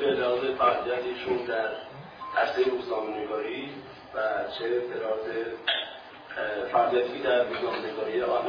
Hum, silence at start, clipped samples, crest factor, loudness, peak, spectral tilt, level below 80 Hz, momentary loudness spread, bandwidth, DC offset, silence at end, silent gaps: none; 0 s; under 0.1%; 18 dB; -28 LUFS; -10 dBFS; -6 dB/octave; -64 dBFS; 13 LU; 5.4 kHz; under 0.1%; 0 s; none